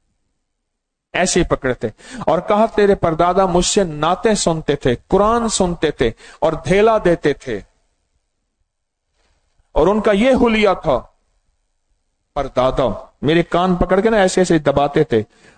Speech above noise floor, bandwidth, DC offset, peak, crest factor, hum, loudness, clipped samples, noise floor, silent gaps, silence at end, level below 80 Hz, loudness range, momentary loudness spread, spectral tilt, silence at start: 60 dB; 9.4 kHz; under 0.1%; -4 dBFS; 14 dB; none; -16 LUFS; under 0.1%; -75 dBFS; none; 0.35 s; -34 dBFS; 4 LU; 8 LU; -5 dB/octave; 1.15 s